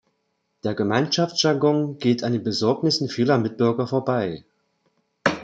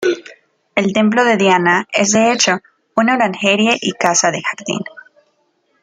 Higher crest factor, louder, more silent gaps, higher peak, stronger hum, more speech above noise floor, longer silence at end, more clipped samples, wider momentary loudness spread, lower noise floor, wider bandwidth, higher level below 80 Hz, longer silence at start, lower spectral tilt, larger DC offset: about the same, 20 dB vs 16 dB; second, -22 LUFS vs -14 LUFS; neither; about the same, -2 dBFS vs 0 dBFS; neither; about the same, 51 dB vs 48 dB; second, 0 s vs 0.8 s; neither; second, 6 LU vs 10 LU; first, -73 dBFS vs -62 dBFS; second, 9 kHz vs 10 kHz; about the same, -64 dBFS vs -62 dBFS; first, 0.65 s vs 0 s; first, -5.5 dB/octave vs -3 dB/octave; neither